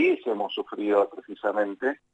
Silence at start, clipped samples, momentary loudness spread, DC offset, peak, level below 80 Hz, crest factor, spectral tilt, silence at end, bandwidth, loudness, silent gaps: 0 s; under 0.1%; 6 LU; under 0.1%; -10 dBFS; -78 dBFS; 16 dB; -6 dB/octave; 0.2 s; 8 kHz; -27 LUFS; none